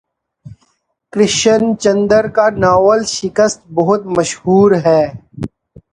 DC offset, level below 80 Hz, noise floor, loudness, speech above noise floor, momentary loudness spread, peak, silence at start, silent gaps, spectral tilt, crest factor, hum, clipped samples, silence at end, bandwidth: under 0.1%; -46 dBFS; -61 dBFS; -13 LUFS; 49 dB; 12 LU; 0 dBFS; 0.45 s; none; -4.5 dB/octave; 14 dB; none; under 0.1%; 0.45 s; 10.5 kHz